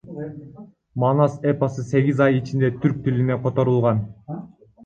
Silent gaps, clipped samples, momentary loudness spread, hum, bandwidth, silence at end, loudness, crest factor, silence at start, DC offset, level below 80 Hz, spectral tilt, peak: none; under 0.1%; 16 LU; none; 7.4 kHz; 0.4 s; -21 LUFS; 18 dB; 0.05 s; under 0.1%; -54 dBFS; -9 dB/octave; -4 dBFS